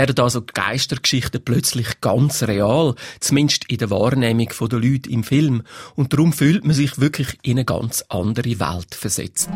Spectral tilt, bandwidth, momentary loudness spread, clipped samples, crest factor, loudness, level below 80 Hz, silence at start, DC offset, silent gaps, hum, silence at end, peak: -5 dB/octave; 16.5 kHz; 6 LU; under 0.1%; 16 dB; -19 LUFS; -46 dBFS; 0 s; under 0.1%; none; none; 0 s; -2 dBFS